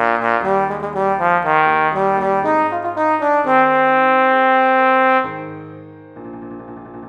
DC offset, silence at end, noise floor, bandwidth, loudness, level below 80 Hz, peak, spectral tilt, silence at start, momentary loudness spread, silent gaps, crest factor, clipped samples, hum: under 0.1%; 0 s; -36 dBFS; 8.6 kHz; -15 LUFS; -58 dBFS; 0 dBFS; -6.5 dB/octave; 0 s; 20 LU; none; 16 dB; under 0.1%; none